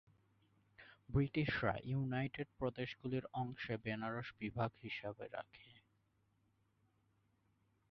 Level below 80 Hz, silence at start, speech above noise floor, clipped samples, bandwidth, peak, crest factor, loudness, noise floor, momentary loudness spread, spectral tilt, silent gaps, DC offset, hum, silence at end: -62 dBFS; 0.8 s; 37 dB; under 0.1%; 6 kHz; -22 dBFS; 22 dB; -42 LUFS; -79 dBFS; 13 LU; -5.5 dB/octave; none; under 0.1%; none; 2.15 s